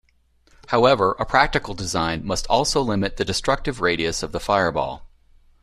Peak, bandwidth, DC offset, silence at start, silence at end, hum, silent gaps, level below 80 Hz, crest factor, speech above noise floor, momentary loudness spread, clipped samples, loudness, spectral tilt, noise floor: -2 dBFS; 14 kHz; under 0.1%; 0.7 s; 0.55 s; none; none; -38 dBFS; 20 dB; 39 dB; 8 LU; under 0.1%; -21 LUFS; -4 dB/octave; -60 dBFS